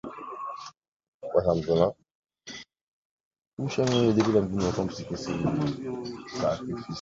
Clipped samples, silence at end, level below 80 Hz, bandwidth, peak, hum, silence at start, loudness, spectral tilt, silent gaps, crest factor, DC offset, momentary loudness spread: under 0.1%; 0 s; -52 dBFS; 7.8 kHz; -8 dBFS; none; 0.05 s; -28 LUFS; -6.5 dB/octave; 0.77-0.81 s, 0.88-1.00 s, 1.08-1.20 s, 2.11-2.23 s, 2.81-3.31 s, 3.47-3.57 s; 20 dB; under 0.1%; 19 LU